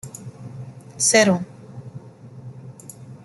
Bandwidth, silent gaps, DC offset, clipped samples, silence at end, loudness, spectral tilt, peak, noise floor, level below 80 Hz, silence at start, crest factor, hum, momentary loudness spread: 12 kHz; none; under 0.1%; under 0.1%; 0.1 s; -17 LUFS; -3 dB/octave; -2 dBFS; -41 dBFS; -62 dBFS; 0.05 s; 24 dB; none; 25 LU